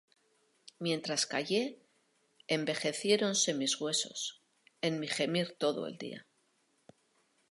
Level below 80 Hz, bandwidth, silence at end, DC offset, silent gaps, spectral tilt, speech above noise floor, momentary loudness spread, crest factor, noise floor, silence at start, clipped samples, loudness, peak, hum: -86 dBFS; 11.5 kHz; 1.3 s; under 0.1%; none; -3 dB/octave; 41 dB; 11 LU; 20 dB; -74 dBFS; 0.8 s; under 0.1%; -33 LUFS; -14 dBFS; none